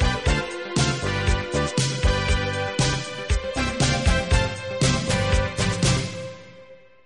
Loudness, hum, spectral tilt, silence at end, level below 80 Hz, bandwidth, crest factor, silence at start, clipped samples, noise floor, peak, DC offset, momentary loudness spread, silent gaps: -23 LUFS; none; -4.5 dB/octave; 0.3 s; -28 dBFS; 11.5 kHz; 16 dB; 0 s; under 0.1%; -48 dBFS; -6 dBFS; 0.2%; 6 LU; none